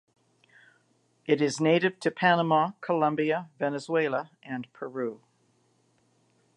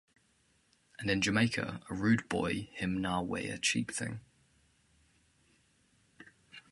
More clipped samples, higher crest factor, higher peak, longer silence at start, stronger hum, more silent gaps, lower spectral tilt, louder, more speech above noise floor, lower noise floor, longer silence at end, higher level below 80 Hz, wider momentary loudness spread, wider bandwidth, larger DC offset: neither; about the same, 20 dB vs 22 dB; first, -8 dBFS vs -14 dBFS; first, 1.3 s vs 1 s; neither; neither; about the same, -5.5 dB/octave vs -4.5 dB/octave; first, -27 LUFS vs -33 LUFS; about the same, 41 dB vs 38 dB; about the same, -68 dBFS vs -71 dBFS; first, 1.4 s vs 0.15 s; second, -82 dBFS vs -60 dBFS; first, 14 LU vs 11 LU; about the same, 11.5 kHz vs 11.5 kHz; neither